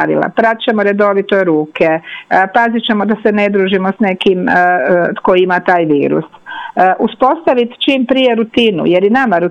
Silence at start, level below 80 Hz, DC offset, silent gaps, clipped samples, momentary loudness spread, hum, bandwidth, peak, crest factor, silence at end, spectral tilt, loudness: 0 s; -54 dBFS; under 0.1%; none; under 0.1%; 3 LU; none; 9.2 kHz; 0 dBFS; 12 dB; 0 s; -7 dB/octave; -12 LUFS